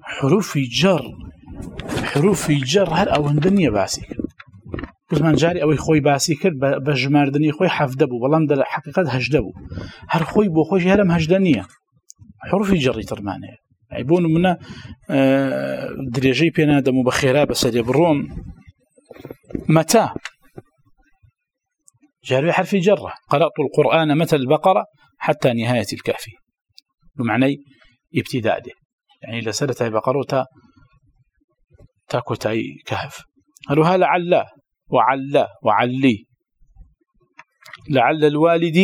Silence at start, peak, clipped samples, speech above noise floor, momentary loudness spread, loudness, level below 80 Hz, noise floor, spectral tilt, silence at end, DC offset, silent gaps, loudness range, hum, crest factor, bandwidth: 0.05 s; 0 dBFS; under 0.1%; 61 dB; 16 LU; -18 LUFS; -46 dBFS; -79 dBFS; -6 dB/octave; 0 s; under 0.1%; 28.85-28.98 s, 31.44-31.48 s; 6 LU; none; 18 dB; 18.5 kHz